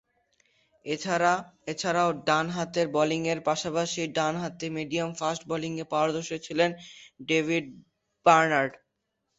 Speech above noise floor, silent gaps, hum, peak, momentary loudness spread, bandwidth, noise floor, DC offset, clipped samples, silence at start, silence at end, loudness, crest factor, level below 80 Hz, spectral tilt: 53 dB; none; none; -6 dBFS; 9 LU; 8.2 kHz; -80 dBFS; under 0.1%; under 0.1%; 0.85 s; 0.65 s; -27 LUFS; 22 dB; -68 dBFS; -4.5 dB/octave